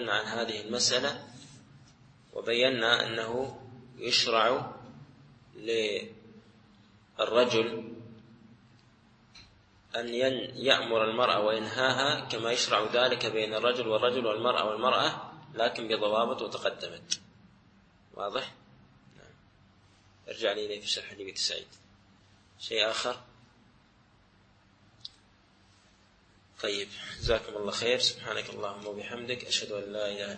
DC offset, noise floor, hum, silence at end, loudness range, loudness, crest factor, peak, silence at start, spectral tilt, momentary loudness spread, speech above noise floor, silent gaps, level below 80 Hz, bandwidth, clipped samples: under 0.1%; -63 dBFS; none; 0 s; 10 LU; -29 LUFS; 26 dB; -6 dBFS; 0 s; -2.5 dB/octave; 16 LU; 33 dB; none; -58 dBFS; 8.8 kHz; under 0.1%